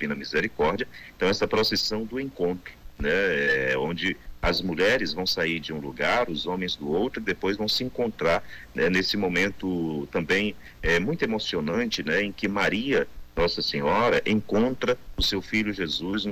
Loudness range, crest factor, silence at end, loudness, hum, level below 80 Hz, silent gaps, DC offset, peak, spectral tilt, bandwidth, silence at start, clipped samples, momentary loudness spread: 2 LU; 12 dB; 0 s; -26 LUFS; none; -44 dBFS; none; under 0.1%; -14 dBFS; -4.5 dB/octave; 16 kHz; 0 s; under 0.1%; 7 LU